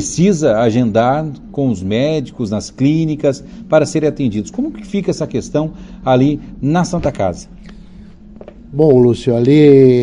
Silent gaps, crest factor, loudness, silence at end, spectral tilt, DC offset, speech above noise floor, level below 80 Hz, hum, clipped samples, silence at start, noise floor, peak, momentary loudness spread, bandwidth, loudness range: none; 14 dB; -14 LUFS; 0 s; -7 dB/octave; under 0.1%; 23 dB; -40 dBFS; none; under 0.1%; 0 s; -36 dBFS; 0 dBFS; 11 LU; 10.5 kHz; 3 LU